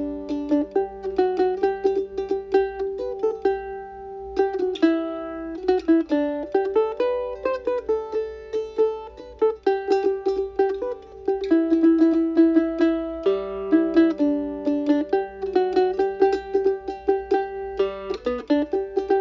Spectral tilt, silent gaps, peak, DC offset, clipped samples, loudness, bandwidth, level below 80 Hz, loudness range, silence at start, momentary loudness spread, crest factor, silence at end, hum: -6.5 dB/octave; none; -6 dBFS; under 0.1%; under 0.1%; -23 LUFS; 7.2 kHz; -50 dBFS; 4 LU; 0 s; 10 LU; 16 dB; 0 s; none